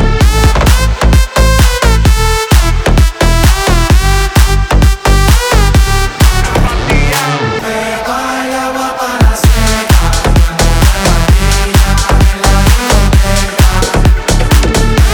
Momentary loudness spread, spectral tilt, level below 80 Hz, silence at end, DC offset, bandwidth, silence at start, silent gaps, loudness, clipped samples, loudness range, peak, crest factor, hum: 5 LU; -4.5 dB/octave; -10 dBFS; 0 s; under 0.1%; 19.5 kHz; 0 s; none; -10 LUFS; 0.9%; 3 LU; 0 dBFS; 8 dB; none